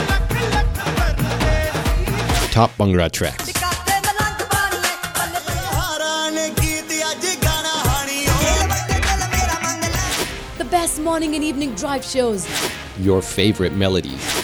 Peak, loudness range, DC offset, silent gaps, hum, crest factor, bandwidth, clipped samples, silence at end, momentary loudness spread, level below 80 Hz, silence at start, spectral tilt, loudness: 0 dBFS; 2 LU; under 0.1%; none; none; 18 dB; over 20 kHz; under 0.1%; 0 s; 5 LU; -28 dBFS; 0 s; -4 dB/octave; -19 LUFS